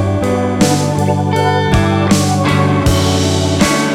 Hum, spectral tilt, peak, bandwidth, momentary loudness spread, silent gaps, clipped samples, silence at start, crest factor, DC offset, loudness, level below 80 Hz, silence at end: none; -5.5 dB/octave; 0 dBFS; 16 kHz; 2 LU; none; under 0.1%; 0 s; 12 dB; under 0.1%; -13 LUFS; -28 dBFS; 0 s